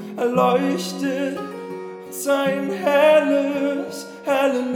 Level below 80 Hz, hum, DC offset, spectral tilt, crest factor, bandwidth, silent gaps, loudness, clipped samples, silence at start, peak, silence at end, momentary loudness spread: -78 dBFS; none; under 0.1%; -5 dB/octave; 16 dB; 18.5 kHz; none; -20 LUFS; under 0.1%; 0 s; -4 dBFS; 0 s; 16 LU